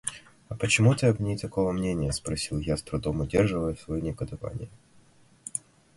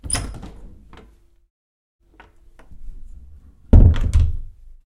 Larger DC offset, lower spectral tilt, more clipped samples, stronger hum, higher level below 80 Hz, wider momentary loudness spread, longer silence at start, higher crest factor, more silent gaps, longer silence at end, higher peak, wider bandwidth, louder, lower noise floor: neither; about the same, -5.5 dB/octave vs -6 dB/octave; neither; neither; second, -44 dBFS vs -22 dBFS; second, 16 LU vs 24 LU; about the same, 0.05 s vs 0.05 s; about the same, 20 dB vs 20 dB; second, none vs 1.50-1.99 s; about the same, 0.4 s vs 0.5 s; second, -8 dBFS vs 0 dBFS; about the same, 11.5 kHz vs 11.5 kHz; second, -28 LUFS vs -17 LUFS; first, -58 dBFS vs -51 dBFS